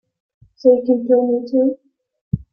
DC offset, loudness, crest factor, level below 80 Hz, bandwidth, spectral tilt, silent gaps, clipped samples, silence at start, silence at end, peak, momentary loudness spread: under 0.1%; -17 LUFS; 16 dB; -48 dBFS; 5.8 kHz; -11 dB/octave; 2.21-2.31 s; under 0.1%; 0.65 s; 0.1 s; -2 dBFS; 12 LU